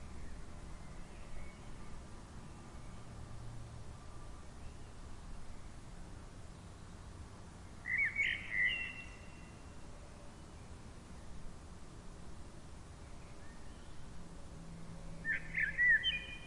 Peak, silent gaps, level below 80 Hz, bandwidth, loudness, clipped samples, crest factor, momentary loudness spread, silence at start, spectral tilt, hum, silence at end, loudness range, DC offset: -22 dBFS; none; -54 dBFS; 11.5 kHz; -34 LUFS; under 0.1%; 20 dB; 21 LU; 0 s; -3.5 dB/octave; none; 0 s; 16 LU; under 0.1%